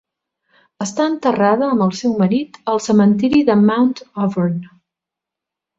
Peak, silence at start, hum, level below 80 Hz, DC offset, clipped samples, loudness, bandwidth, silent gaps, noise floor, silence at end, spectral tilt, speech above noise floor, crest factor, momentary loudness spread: -2 dBFS; 0.8 s; none; -56 dBFS; under 0.1%; under 0.1%; -16 LUFS; 7.8 kHz; none; -85 dBFS; 1.1 s; -6.5 dB/octave; 69 dB; 16 dB; 8 LU